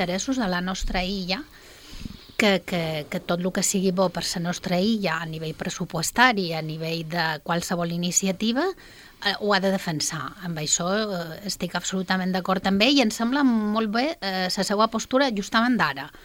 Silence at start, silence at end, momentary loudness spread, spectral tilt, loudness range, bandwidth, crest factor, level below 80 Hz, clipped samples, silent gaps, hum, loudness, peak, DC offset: 0 s; 0.05 s; 10 LU; -3.5 dB/octave; 3 LU; 17 kHz; 22 dB; -46 dBFS; under 0.1%; none; none; -24 LUFS; -2 dBFS; under 0.1%